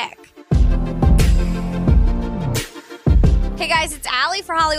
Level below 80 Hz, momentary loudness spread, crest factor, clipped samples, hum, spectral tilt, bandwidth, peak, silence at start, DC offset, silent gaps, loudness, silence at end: -18 dBFS; 7 LU; 14 dB; under 0.1%; none; -5.5 dB/octave; 15.5 kHz; -4 dBFS; 0 s; under 0.1%; none; -19 LUFS; 0 s